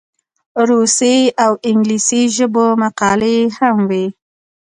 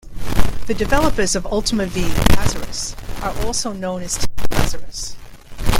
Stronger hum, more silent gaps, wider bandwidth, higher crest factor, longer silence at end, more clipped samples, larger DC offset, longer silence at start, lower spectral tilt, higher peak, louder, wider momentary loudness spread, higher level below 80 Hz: neither; neither; second, 11 kHz vs 17 kHz; about the same, 14 dB vs 16 dB; first, 0.6 s vs 0 s; second, under 0.1% vs 0.1%; neither; first, 0.55 s vs 0.05 s; about the same, -3.5 dB/octave vs -4 dB/octave; about the same, 0 dBFS vs 0 dBFS; first, -13 LUFS vs -21 LUFS; second, 6 LU vs 11 LU; second, -56 dBFS vs -24 dBFS